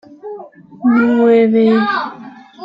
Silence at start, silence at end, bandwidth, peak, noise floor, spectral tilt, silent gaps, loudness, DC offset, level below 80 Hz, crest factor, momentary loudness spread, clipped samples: 0.25 s; 0 s; 5.4 kHz; -2 dBFS; -35 dBFS; -8 dB/octave; none; -13 LUFS; under 0.1%; -62 dBFS; 12 dB; 20 LU; under 0.1%